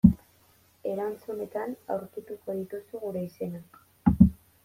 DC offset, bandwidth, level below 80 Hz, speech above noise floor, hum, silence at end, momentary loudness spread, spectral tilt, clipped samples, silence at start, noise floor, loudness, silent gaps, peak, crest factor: under 0.1%; 15 kHz; -42 dBFS; 27 dB; none; 0.3 s; 16 LU; -10.5 dB/octave; under 0.1%; 0.05 s; -62 dBFS; -29 LUFS; none; -4 dBFS; 24 dB